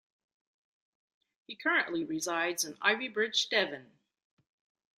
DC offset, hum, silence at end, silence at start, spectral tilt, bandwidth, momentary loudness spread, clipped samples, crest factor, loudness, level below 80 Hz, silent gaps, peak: under 0.1%; none; 1.15 s; 1.5 s; -1.5 dB/octave; 15.5 kHz; 7 LU; under 0.1%; 24 dB; -30 LUFS; -82 dBFS; none; -10 dBFS